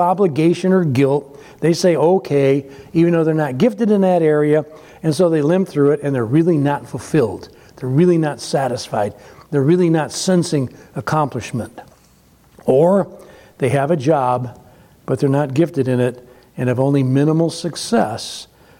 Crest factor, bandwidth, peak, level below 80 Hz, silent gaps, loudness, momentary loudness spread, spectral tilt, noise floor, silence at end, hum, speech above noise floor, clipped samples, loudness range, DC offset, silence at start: 14 dB; 16 kHz; -4 dBFS; -56 dBFS; none; -17 LUFS; 11 LU; -7 dB/octave; -51 dBFS; 0.35 s; none; 35 dB; under 0.1%; 3 LU; under 0.1%; 0 s